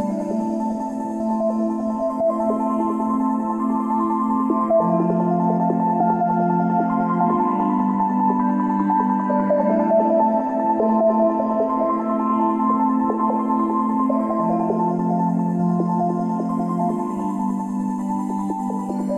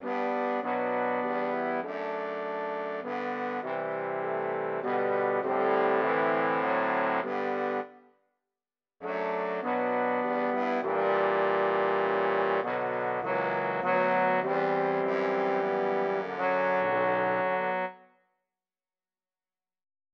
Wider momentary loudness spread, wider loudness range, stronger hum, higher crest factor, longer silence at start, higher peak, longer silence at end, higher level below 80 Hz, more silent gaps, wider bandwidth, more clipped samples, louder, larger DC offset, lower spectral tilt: about the same, 6 LU vs 7 LU; about the same, 3 LU vs 5 LU; neither; about the same, 12 dB vs 14 dB; about the same, 0 s vs 0 s; first, -8 dBFS vs -14 dBFS; second, 0 s vs 2.15 s; first, -58 dBFS vs -80 dBFS; neither; first, 9.6 kHz vs 6.4 kHz; neither; first, -20 LUFS vs -29 LUFS; neither; first, -10 dB/octave vs -7 dB/octave